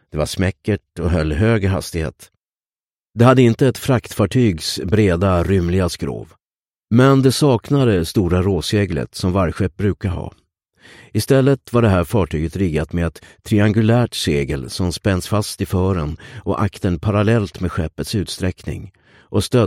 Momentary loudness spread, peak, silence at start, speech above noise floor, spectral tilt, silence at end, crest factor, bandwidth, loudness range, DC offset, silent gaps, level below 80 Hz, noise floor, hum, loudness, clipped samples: 10 LU; 0 dBFS; 0.15 s; over 73 dB; -6.5 dB/octave; 0 s; 18 dB; 16.5 kHz; 4 LU; under 0.1%; 2.53-2.57 s, 2.83-3.05 s, 6.45-6.51 s, 6.67-6.72 s; -36 dBFS; under -90 dBFS; none; -18 LUFS; under 0.1%